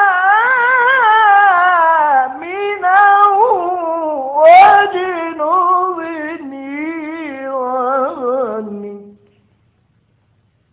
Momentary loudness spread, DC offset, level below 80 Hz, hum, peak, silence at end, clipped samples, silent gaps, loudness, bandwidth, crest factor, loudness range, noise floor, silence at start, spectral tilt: 16 LU; under 0.1%; -60 dBFS; none; 0 dBFS; 1.6 s; under 0.1%; none; -12 LUFS; 4 kHz; 12 dB; 11 LU; -58 dBFS; 0 s; -6.5 dB/octave